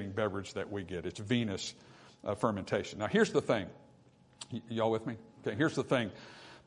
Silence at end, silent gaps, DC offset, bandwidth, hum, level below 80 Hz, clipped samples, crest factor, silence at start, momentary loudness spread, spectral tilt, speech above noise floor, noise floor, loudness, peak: 0.1 s; none; under 0.1%; 11 kHz; none; -70 dBFS; under 0.1%; 22 dB; 0 s; 14 LU; -5.5 dB/octave; 29 dB; -63 dBFS; -34 LUFS; -14 dBFS